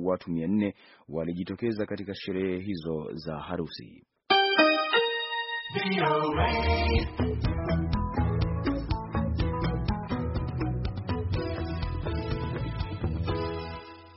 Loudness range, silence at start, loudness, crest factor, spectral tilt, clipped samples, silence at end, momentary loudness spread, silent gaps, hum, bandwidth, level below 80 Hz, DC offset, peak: 7 LU; 0 s; -29 LUFS; 22 dB; -4.5 dB/octave; under 0.1%; 0 s; 10 LU; none; none; 5.8 kHz; -38 dBFS; under 0.1%; -8 dBFS